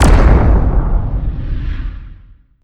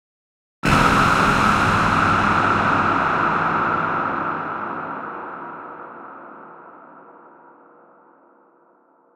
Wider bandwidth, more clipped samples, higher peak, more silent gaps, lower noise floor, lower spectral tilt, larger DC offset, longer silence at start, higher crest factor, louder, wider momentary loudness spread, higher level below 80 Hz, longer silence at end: second, 11.5 kHz vs 16 kHz; first, 0.3% vs under 0.1%; about the same, 0 dBFS vs -2 dBFS; neither; second, -41 dBFS vs -57 dBFS; first, -7 dB/octave vs -5 dB/octave; neither; second, 0 s vs 0.65 s; second, 12 dB vs 18 dB; first, -15 LUFS vs -18 LUFS; second, 16 LU vs 21 LU; first, -14 dBFS vs -40 dBFS; second, 0.5 s vs 2.15 s